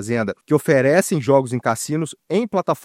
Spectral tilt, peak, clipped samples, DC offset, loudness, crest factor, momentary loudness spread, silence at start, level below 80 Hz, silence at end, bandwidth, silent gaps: -5.5 dB/octave; -2 dBFS; under 0.1%; under 0.1%; -19 LUFS; 18 dB; 8 LU; 0 s; -62 dBFS; 0.05 s; 16 kHz; none